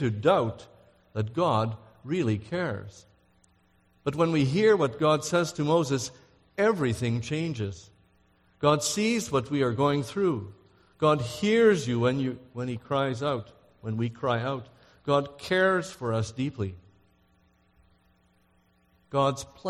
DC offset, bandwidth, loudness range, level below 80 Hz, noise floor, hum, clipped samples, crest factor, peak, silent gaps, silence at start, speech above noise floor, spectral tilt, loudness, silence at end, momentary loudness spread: under 0.1%; 14 kHz; 6 LU; -60 dBFS; -66 dBFS; none; under 0.1%; 20 dB; -8 dBFS; none; 0 s; 39 dB; -5.5 dB/octave; -27 LUFS; 0 s; 12 LU